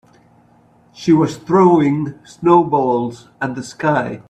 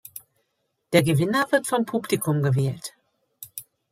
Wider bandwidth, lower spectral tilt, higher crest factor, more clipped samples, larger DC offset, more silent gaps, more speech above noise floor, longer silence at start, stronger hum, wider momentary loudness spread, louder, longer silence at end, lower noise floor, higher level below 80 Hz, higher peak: second, 9 kHz vs 16 kHz; first, -7.5 dB/octave vs -5.5 dB/octave; second, 16 dB vs 22 dB; neither; neither; neither; second, 36 dB vs 53 dB; first, 1 s vs 0.15 s; neither; second, 13 LU vs 19 LU; first, -16 LUFS vs -23 LUFS; second, 0.1 s vs 0.3 s; second, -51 dBFS vs -75 dBFS; first, -56 dBFS vs -64 dBFS; first, 0 dBFS vs -4 dBFS